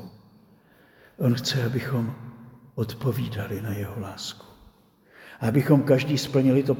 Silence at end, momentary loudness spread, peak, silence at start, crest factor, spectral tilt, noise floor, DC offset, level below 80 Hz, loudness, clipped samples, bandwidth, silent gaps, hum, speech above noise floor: 0 s; 17 LU; -6 dBFS; 0 s; 20 dB; -6.5 dB/octave; -57 dBFS; under 0.1%; -60 dBFS; -25 LUFS; under 0.1%; 20 kHz; none; none; 33 dB